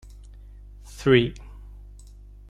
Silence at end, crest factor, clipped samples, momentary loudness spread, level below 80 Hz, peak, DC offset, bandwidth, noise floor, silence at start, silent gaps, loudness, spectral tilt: 1.1 s; 24 dB; under 0.1%; 27 LU; -44 dBFS; -4 dBFS; under 0.1%; 12.5 kHz; -45 dBFS; 0.95 s; none; -22 LUFS; -6.5 dB/octave